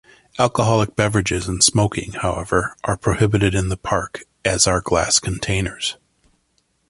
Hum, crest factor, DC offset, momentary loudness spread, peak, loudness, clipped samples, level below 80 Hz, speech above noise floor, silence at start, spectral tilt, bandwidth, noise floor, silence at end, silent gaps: none; 20 dB; under 0.1%; 9 LU; 0 dBFS; -19 LUFS; under 0.1%; -36 dBFS; 47 dB; 0.35 s; -4 dB/octave; 11.5 kHz; -66 dBFS; 0.95 s; none